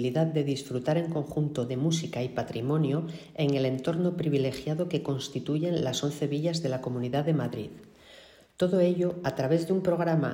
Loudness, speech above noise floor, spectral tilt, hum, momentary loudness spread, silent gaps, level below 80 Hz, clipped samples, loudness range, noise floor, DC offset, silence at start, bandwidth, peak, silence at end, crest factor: -29 LUFS; 26 dB; -6.5 dB/octave; none; 6 LU; none; -62 dBFS; under 0.1%; 2 LU; -54 dBFS; under 0.1%; 0 s; 16 kHz; -12 dBFS; 0 s; 16 dB